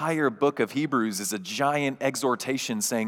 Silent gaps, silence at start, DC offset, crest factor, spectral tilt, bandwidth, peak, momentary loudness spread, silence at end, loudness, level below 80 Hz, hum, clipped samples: none; 0 s; under 0.1%; 16 dB; -4 dB/octave; 18.5 kHz; -10 dBFS; 3 LU; 0 s; -26 LUFS; -88 dBFS; none; under 0.1%